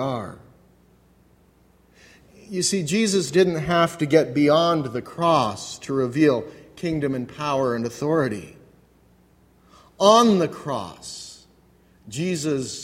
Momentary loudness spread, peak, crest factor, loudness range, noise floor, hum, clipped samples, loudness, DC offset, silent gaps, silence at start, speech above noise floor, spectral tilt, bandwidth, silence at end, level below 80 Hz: 16 LU; -2 dBFS; 22 dB; 6 LU; -57 dBFS; none; under 0.1%; -21 LUFS; under 0.1%; none; 0 s; 36 dB; -5 dB/octave; 16 kHz; 0 s; -56 dBFS